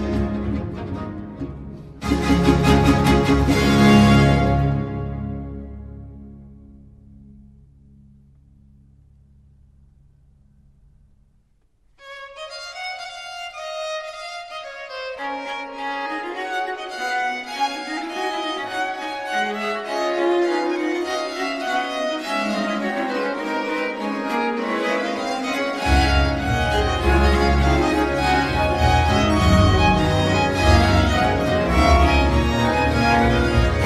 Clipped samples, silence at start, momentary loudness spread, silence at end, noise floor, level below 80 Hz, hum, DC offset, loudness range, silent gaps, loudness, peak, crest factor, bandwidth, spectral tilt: under 0.1%; 0 s; 16 LU; 0 s; -60 dBFS; -28 dBFS; none; under 0.1%; 15 LU; none; -20 LUFS; -2 dBFS; 18 dB; 14.5 kHz; -6 dB/octave